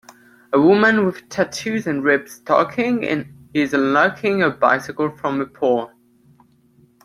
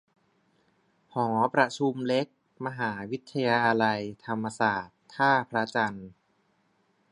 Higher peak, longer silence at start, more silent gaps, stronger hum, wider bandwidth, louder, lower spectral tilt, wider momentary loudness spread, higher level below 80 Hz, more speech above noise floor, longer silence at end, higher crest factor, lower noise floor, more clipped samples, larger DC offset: first, 0 dBFS vs -6 dBFS; second, 0.5 s vs 1.15 s; neither; neither; first, 14.5 kHz vs 11 kHz; first, -19 LUFS vs -28 LUFS; about the same, -5.5 dB/octave vs -5.5 dB/octave; second, 9 LU vs 13 LU; first, -60 dBFS vs -70 dBFS; second, 37 dB vs 43 dB; first, 1.15 s vs 1 s; about the same, 18 dB vs 22 dB; second, -55 dBFS vs -70 dBFS; neither; neither